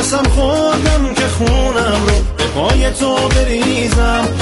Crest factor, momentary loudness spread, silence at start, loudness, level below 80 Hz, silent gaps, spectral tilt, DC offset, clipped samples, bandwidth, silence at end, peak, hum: 12 dB; 2 LU; 0 s; -14 LUFS; -18 dBFS; none; -4.5 dB/octave; under 0.1%; under 0.1%; 11.5 kHz; 0 s; 0 dBFS; none